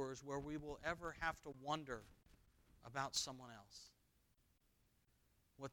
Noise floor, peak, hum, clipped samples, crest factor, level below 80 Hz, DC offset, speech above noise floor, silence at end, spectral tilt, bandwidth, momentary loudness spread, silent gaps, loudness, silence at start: -79 dBFS; -26 dBFS; none; under 0.1%; 24 dB; -68 dBFS; under 0.1%; 31 dB; 0 s; -3 dB/octave; 19 kHz; 17 LU; none; -47 LUFS; 0 s